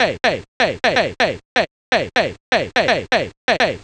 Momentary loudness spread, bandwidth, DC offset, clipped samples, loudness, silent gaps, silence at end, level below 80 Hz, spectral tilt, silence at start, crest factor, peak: 4 LU; 10 kHz; under 0.1%; under 0.1%; -18 LUFS; 0.48-0.60 s, 1.45-1.56 s, 1.71-1.92 s, 2.40-2.52 s, 3.37-3.48 s; 0.05 s; -48 dBFS; -3.5 dB/octave; 0 s; 18 dB; 0 dBFS